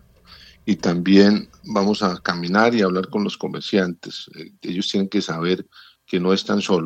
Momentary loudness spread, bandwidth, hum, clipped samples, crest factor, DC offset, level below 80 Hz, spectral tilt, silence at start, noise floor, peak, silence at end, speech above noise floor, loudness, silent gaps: 13 LU; 8.4 kHz; none; under 0.1%; 20 dB; under 0.1%; -60 dBFS; -6 dB/octave; 0.65 s; -47 dBFS; -2 dBFS; 0 s; 28 dB; -20 LUFS; none